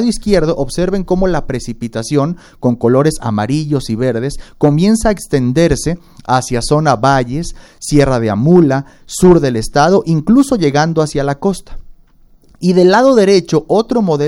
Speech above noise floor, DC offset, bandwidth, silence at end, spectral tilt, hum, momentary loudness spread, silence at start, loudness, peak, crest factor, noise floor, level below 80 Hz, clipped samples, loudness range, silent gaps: 33 dB; under 0.1%; 16 kHz; 0 s; -6 dB/octave; none; 11 LU; 0 s; -13 LUFS; 0 dBFS; 12 dB; -45 dBFS; -30 dBFS; under 0.1%; 4 LU; none